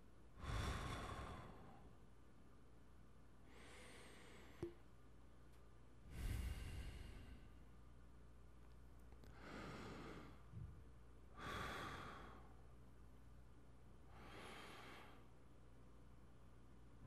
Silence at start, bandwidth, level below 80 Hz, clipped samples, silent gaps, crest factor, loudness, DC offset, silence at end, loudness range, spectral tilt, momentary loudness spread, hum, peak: 0 s; 15 kHz; -60 dBFS; under 0.1%; none; 22 dB; -56 LUFS; under 0.1%; 0 s; 7 LU; -5 dB/octave; 18 LU; none; -36 dBFS